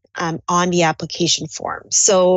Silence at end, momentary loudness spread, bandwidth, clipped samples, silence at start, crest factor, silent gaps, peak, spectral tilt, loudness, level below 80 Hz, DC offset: 0 s; 11 LU; 8.8 kHz; under 0.1%; 0.15 s; 14 dB; none; -4 dBFS; -3 dB/octave; -17 LUFS; -56 dBFS; under 0.1%